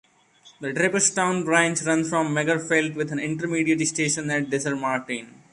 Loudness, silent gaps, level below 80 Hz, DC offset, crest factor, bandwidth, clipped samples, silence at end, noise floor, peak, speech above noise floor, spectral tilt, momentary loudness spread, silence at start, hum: -23 LUFS; none; -66 dBFS; under 0.1%; 20 dB; 11.5 kHz; under 0.1%; 0.2 s; -55 dBFS; -4 dBFS; 31 dB; -3.5 dB/octave; 8 LU; 0.45 s; none